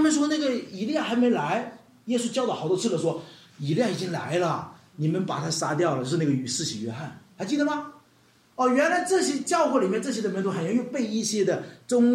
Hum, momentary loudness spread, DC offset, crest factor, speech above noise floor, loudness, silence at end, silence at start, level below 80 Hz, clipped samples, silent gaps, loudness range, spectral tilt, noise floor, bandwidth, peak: none; 10 LU; under 0.1%; 16 dB; 35 dB; -26 LUFS; 0 s; 0 s; -72 dBFS; under 0.1%; none; 3 LU; -5 dB/octave; -60 dBFS; 15 kHz; -10 dBFS